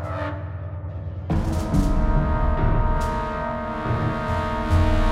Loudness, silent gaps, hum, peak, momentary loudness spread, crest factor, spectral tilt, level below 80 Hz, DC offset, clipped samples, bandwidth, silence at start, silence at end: -24 LUFS; none; none; -8 dBFS; 11 LU; 14 dB; -7.5 dB/octave; -26 dBFS; under 0.1%; under 0.1%; 12 kHz; 0 s; 0 s